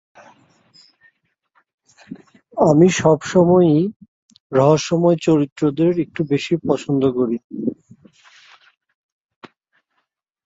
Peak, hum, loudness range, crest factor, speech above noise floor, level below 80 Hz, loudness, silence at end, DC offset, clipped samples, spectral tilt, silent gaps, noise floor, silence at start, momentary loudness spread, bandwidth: -2 dBFS; none; 9 LU; 18 dB; 57 dB; -56 dBFS; -17 LUFS; 2.75 s; under 0.1%; under 0.1%; -6.5 dB/octave; 3.96-4.00 s, 4.08-4.29 s, 4.40-4.50 s, 5.52-5.56 s, 7.44-7.50 s; -73 dBFS; 2.1 s; 13 LU; 8 kHz